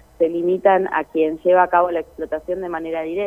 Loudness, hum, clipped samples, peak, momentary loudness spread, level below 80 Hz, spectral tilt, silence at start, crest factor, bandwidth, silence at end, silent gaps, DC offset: -19 LUFS; none; under 0.1%; -2 dBFS; 10 LU; -52 dBFS; -7.5 dB/octave; 0.2 s; 18 dB; 14.5 kHz; 0 s; none; under 0.1%